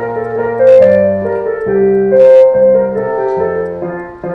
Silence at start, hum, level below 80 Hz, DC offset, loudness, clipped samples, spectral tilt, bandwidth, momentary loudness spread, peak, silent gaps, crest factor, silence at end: 0 s; none; -46 dBFS; under 0.1%; -10 LUFS; 0.4%; -9 dB/octave; 4.6 kHz; 12 LU; 0 dBFS; none; 10 dB; 0 s